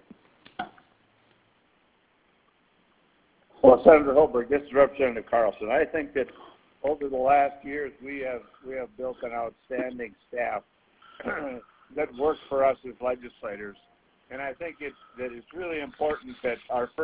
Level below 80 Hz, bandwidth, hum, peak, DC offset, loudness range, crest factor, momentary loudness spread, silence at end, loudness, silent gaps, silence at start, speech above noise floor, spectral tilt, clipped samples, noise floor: -58 dBFS; 4 kHz; none; 0 dBFS; under 0.1%; 13 LU; 26 dB; 17 LU; 0 s; -26 LUFS; none; 0.6 s; 40 dB; -9 dB/octave; under 0.1%; -66 dBFS